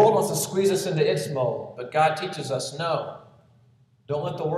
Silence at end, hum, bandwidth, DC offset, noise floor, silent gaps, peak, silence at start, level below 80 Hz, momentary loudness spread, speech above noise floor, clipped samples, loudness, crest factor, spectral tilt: 0 s; none; 14.5 kHz; under 0.1%; -59 dBFS; none; -6 dBFS; 0 s; -68 dBFS; 8 LU; 34 dB; under 0.1%; -25 LUFS; 18 dB; -4.5 dB/octave